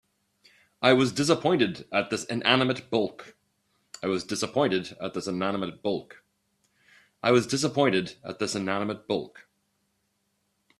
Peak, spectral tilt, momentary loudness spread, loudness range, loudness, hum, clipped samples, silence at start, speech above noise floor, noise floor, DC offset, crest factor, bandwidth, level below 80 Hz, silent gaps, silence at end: -2 dBFS; -4.5 dB/octave; 10 LU; 5 LU; -26 LUFS; none; under 0.1%; 0.8 s; 49 dB; -75 dBFS; under 0.1%; 26 dB; 13 kHz; -66 dBFS; none; 1.4 s